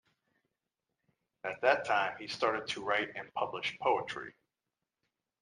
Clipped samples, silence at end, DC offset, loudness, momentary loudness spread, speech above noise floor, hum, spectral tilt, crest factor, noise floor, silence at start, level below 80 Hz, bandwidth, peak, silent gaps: under 0.1%; 1.1 s; under 0.1%; -33 LUFS; 12 LU; 56 dB; none; -3.5 dB/octave; 24 dB; -89 dBFS; 1.45 s; -76 dBFS; 11 kHz; -12 dBFS; none